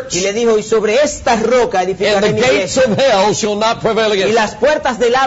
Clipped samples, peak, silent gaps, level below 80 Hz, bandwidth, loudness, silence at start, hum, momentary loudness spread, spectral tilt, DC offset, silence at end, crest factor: under 0.1%; -4 dBFS; none; -42 dBFS; 8 kHz; -13 LUFS; 0 s; none; 3 LU; -3.5 dB/octave; under 0.1%; 0 s; 10 dB